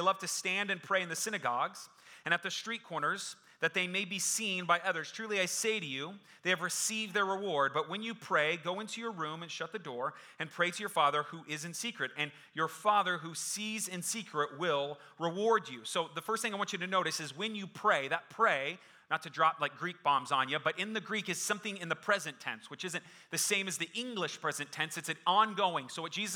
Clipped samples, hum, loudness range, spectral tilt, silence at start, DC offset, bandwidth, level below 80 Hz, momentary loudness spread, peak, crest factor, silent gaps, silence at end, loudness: under 0.1%; none; 2 LU; -2 dB/octave; 0 s; under 0.1%; over 20 kHz; -88 dBFS; 9 LU; -12 dBFS; 22 dB; none; 0 s; -34 LUFS